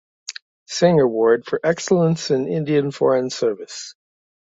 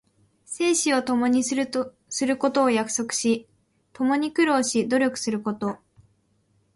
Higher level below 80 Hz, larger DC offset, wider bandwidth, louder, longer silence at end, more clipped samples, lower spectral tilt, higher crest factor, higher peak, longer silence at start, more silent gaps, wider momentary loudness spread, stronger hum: about the same, -62 dBFS vs -66 dBFS; neither; second, 8 kHz vs 11.5 kHz; first, -19 LUFS vs -24 LUFS; second, 0.65 s vs 1 s; neither; first, -5.5 dB/octave vs -3 dB/octave; about the same, 16 dB vs 16 dB; first, -4 dBFS vs -8 dBFS; second, 0.3 s vs 0.5 s; first, 0.42-0.66 s vs none; first, 18 LU vs 9 LU; neither